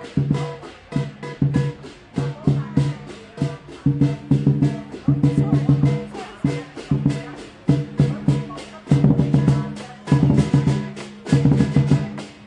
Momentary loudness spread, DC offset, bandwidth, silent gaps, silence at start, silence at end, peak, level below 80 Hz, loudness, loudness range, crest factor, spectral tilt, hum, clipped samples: 14 LU; under 0.1%; 9.8 kHz; none; 0 s; 0 s; -2 dBFS; -42 dBFS; -21 LUFS; 5 LU; 18 dB; -8.5 dB/octave; none; under 0.1%